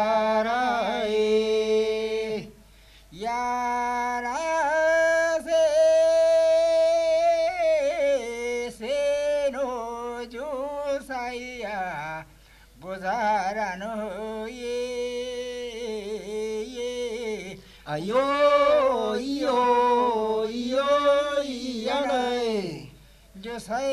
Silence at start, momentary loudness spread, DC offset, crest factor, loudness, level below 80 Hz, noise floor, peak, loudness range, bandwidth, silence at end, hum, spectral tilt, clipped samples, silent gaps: 0 s; 13 LU; under 0.1%; 16 dB; -25 LUFS; -56 dBFS; -52 dBFS; -10 dBFS; 10 LU; 13.5 kHz; 0 s; none; -3.5 dB/octave; under 0.1%; none